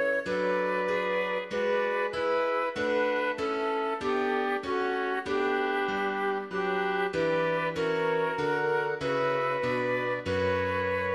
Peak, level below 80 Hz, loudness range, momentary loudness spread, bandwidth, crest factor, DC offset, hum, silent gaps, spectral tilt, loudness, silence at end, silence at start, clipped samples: -16 dBFS; -62 dBFS; 1 LU; 2 LU; 11.5 kHz; 12 dB; under 0.1%; none; none; -5.5 dB/octave; -28 LUFS; 0 s; 0 s; under 0.1%